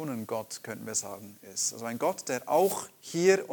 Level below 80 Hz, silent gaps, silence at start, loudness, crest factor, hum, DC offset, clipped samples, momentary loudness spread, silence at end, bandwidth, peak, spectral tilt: -78 dBFS; none; 0 s; -30 LUFS; 20 dB; none; under 0.1%; under 0.1%; 13 LU; 0 s; 19 kHz; -10 dBFS; -3.5 dB/octave